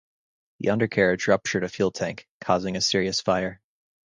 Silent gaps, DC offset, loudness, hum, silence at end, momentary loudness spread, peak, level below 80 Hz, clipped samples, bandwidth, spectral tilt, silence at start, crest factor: 2.29-2.40 s; under 0.1%; -24 LUFS; none; 0.5 s; 9 LU; -4 dBFS; -56 dBFS; under 0.1%; 10 kHz; -4 dB/octave; 0.6 s; 20 dB